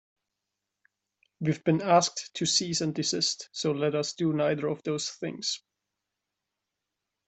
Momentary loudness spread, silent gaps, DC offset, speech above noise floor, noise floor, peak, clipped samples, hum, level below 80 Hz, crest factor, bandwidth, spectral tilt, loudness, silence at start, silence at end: 9 LU; none; under 0.1%; 58 dB; -86 dBFS; -10 dBFS; under 0.1%; none; -72 dBFS; 20 dB; 8.4 kHz; -4 dB/octave; -28 LUFS; 1.4 s; 1.7 s